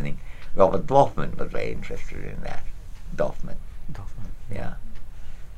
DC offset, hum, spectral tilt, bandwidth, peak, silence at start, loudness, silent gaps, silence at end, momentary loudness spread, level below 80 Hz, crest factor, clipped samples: 1%; none; -7 dB/octave; 7.4 kHz; -2 dBFS; 0 s; -26 LUFS; none; 0 s; 23 LU; -34 dBFS; 20 dB; under 0.1%